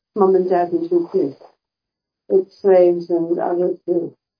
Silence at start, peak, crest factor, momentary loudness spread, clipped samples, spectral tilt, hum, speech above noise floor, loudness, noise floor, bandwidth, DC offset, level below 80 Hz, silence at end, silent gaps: 0.15 s; -2 dBFS; 16 dB; 8 LU; under 0.1%; -10 dB/octave; none; 67 dB; -18 LUFS; -84 dBFS; 5.2 kHz; under 0.1%; -80 dBFS; 0.3 s; none